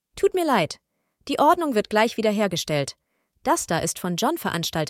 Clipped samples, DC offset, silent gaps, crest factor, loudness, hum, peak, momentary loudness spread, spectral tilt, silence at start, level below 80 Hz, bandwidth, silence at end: under 0.1%; under 0.1%; none; 18 dB; -23 LUFS; none; -4 dBFS; 10 LU; -4 dB/octave; 0.15 s; -58 dBFS; 17 kHz; 0 s